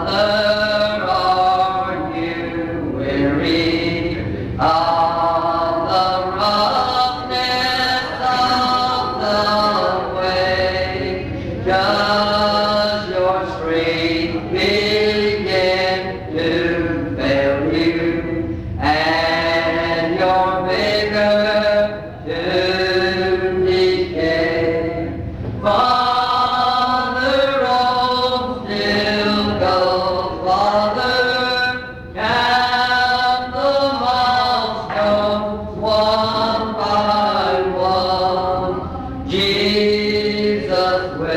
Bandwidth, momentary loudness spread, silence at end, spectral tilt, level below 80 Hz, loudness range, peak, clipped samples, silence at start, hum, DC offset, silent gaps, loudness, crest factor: 15.5 kHz; 7 LU; 0 s; -5.5 dB/octave; -40 dBFS; 2 LU; -6 dBFS; under 0.1%; 0 s; none; under 0.1%; none; -17 LUFS; 12 dB